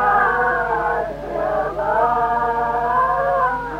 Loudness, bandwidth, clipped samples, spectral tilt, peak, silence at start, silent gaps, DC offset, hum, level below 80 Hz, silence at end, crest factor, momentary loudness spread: -19 LUFS; 13.5 kHz; under 0.1%; -6.5 dB/octave; -6 dBFS; 0 s; none; under 0.1%; none; -40 dBFS; 0 s; 14 dB; 5 LU